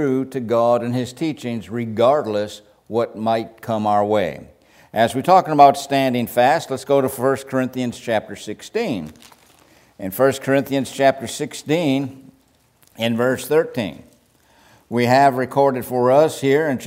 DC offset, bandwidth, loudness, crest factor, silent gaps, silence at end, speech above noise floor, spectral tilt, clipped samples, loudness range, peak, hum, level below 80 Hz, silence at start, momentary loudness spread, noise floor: under 0.1%; 16 kHz; -19 LUFS; 18 dB; none; 0 s; 39 dB; -5.5 dB/octave; under 0.1%; 6 LU; 0 dBFS; none; -60 dBFS; 0 s; 12 LU; -58 dBFS